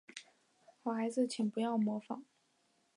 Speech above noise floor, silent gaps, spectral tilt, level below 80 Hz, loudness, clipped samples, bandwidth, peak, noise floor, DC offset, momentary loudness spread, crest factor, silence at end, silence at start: 40 dB; none; -5.5 dB/octave; -90 dBFS; -37 LUFS; under 0.1%; 11 kHz; -22 dBFS; -76 dBFS; under 0.1%; 13 LU; 16 dB; 0.75 s; 0.15 s